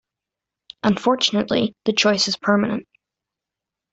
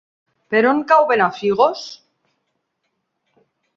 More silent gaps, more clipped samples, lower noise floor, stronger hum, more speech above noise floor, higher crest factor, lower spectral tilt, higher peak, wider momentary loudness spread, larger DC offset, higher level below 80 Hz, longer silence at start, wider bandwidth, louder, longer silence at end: neither; neither; first, -86 dBFS vs -73 dBFS; neither; first, 67 dB vs 57 dB; about the same, 18 dB vs 18 dB; second, -4 dB/octave vs -5.5 dB/octave; about the same, -4 dBFS vs -2 dBFS; second, 6 LU vs 11 LU; neither; first, -60 dBFS vs -66 dBFS; first, 0.85 s vs 0.5 s; first, 8.2 kHz vs 7.4 kHz; second, -20 LUFS vs -16 LUFS; second, 1.1 s vs 1.8 s